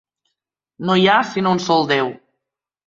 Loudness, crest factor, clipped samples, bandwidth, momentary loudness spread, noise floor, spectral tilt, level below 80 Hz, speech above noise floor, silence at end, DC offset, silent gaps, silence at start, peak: -17 LUFS; 18 dB; under 0.1%; 7.6 kHz; 9 LU; -81 dBFS; -5 dB/octave; -60 dBFS; 65 dB; 0.7 s; under 0.1%; none; 0.8 s; -2 dBFS